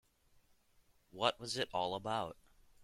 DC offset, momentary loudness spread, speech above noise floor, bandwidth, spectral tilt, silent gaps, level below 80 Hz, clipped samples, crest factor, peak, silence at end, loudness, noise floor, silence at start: under 0.1%; 8 LU; 33 dB; 16 kHz; -3.5 dB/octave; none; -70 dBFS; under 0.1%; 26 dB; -16 dBFS; 0.5 s; -38 LUFS; -71 dBFS; 1.15 s